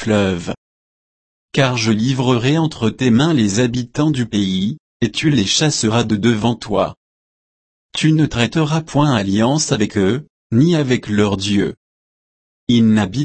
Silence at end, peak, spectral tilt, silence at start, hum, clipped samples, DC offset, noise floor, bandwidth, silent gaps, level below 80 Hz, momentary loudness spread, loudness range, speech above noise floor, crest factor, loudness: 0 s; -2 dBFS; -5.5 dB/octave; 0 s; none; under 0.1%; under 0.1%; under -90 dBFS; 8.8 kHz; 0.57-1.49 s, 4.80-5.00 s, 6.97-7.89 s, 10.30-10.50 s, 11.77-12.67 s; -46 dBFS; 7 LU; 2 LU; over 75 dB; 16 dB; -16 LUFS